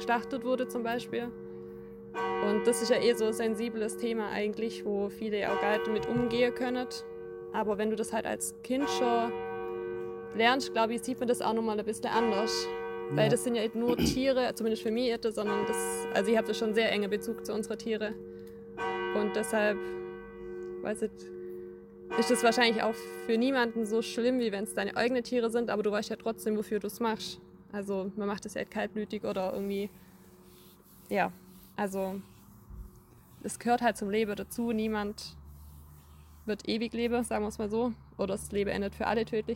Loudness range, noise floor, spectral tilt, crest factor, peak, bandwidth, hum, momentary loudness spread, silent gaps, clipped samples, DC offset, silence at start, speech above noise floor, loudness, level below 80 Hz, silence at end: 6 LU; -56 dBFS; -4.5 dB/octave; 20 dB; -12 dBFS; 17 kHz; none; 14 LU; none; under 0.1%; under 0.1%; 0 s; 25 dB; -31 LUFS; -58 dBFS; 0 s